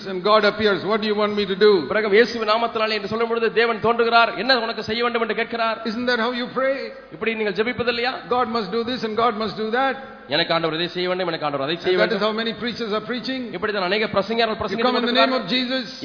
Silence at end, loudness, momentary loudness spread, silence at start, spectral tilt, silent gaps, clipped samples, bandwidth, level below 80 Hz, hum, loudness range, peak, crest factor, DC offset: 0 s; -21 LUFS; 8 LU; 0 s; -5.5 dB/octave; none; under 0.1%; 5.4 kHz; -56 dBFS; none; 4 LU; -2 dBFS; 18 dB; under 0.1%